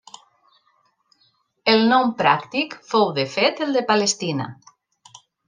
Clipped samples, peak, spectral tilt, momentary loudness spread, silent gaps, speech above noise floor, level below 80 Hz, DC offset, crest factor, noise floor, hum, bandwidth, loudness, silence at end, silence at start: under 0.1%; -2 dBFS; -3.5 dB/octave; 9 LU; none; 45 dB; -70 dBFS; under 0.1%; 20 dB; -64 dBFS; none; 10 kHz; -20 LUFS; 0.95 s; 1.65 s